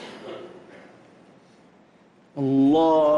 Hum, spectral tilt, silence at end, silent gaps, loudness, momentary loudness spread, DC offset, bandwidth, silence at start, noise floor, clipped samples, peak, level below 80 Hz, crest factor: none; -8 dB/octave; 0 s; none; -20 LUFS; 23 LU; under 0.1%; 7.2 kHz; 0 s; -56 dBFS; under 0.1%; -12 dBFS; -64 dBFS; 12 dB